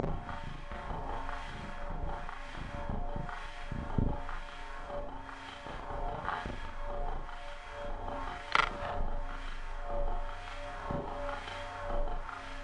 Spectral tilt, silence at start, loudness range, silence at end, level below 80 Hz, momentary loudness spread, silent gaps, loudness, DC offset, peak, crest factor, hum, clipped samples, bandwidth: -5.5 dB/octave; 0 s; 5 LU; 0 s; -40 dBFS; 9 LU; none; -40 LUFS; under 0.1%; -8 dBFS; 28 dB; none; under 0.1%; 9.4 kHz